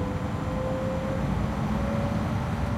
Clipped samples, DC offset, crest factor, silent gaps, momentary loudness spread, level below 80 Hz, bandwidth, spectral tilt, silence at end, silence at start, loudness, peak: under 0.1%; under 0.1%; 12 dB; none; 2 LU; -36 dBFS; 15.5 kHz; -7.5 dB/octave; 0 s; 0 s; -29 LUFS; -16 dBFS